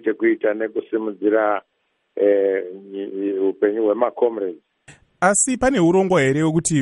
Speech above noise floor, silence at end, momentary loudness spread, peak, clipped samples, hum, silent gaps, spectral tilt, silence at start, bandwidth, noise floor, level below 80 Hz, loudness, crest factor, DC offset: 31 dB; 0 s; 11 LU; -4 dBFS; under 0.1%; none; none; -5 dB/octave; 0.05 s; 11 kHz; -50 dBFS; -52 dBFS; -19 LUFS; 16 dB; under 0.1%